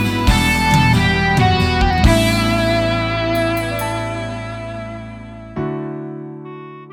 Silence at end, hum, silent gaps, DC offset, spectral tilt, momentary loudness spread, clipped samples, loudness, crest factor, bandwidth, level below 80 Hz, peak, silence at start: 0 s; none; none; under 0.1%; -5.5 dB/octave; 18 LU; under 0.1%; -16 LUFS; 16 dB; 18.5 kHz; -26 dBFS; 0 dBFS; 0 s